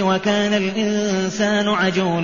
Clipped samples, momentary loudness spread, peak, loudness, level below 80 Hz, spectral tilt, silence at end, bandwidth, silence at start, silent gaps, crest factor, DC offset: under 0.1%; 2 LU; -6 dBFS; -19 LUFS; -56 dBFS; -4 dB/octave; 0 s; 7.4 kHz; 0 s; none; 14 dB; 0.4%